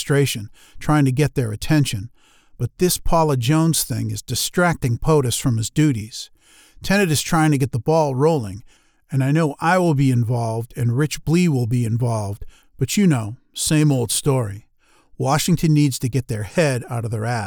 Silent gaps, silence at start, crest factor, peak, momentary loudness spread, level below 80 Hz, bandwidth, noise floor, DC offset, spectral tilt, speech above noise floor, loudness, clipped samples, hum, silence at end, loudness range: none; 0 s; 14 dB; -6 dBFS; 12 LU; -38 dBFS; over 20 kHz; -53 dBFS; under 0.1%; -5.5 dB/octave; 34 dB; -19 LUFS; under 0.1%; none; 0 s; 2 LU